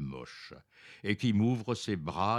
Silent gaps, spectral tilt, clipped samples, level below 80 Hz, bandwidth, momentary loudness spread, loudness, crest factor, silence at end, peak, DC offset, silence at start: none; -6.5 dB/octave; under 0.1%; -62 dBFS; 11.5 kHz; 20 LU; -32 LUFS; 18 dB; 0 s; -14 dBFS; under 0.1%; 0 s